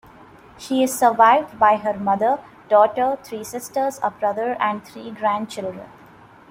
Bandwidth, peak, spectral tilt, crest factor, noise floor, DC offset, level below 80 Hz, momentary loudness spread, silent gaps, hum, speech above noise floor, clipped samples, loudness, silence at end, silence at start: 16.5 kHz; -2 dBFS; -4 dB/octave; 18 dB; -47 dBFS; under 0.1%; -60 dBFS; 16 LU; none; none; 27 dB; under 0.1%; -20 LUFS; 0.65 s; 0.6 s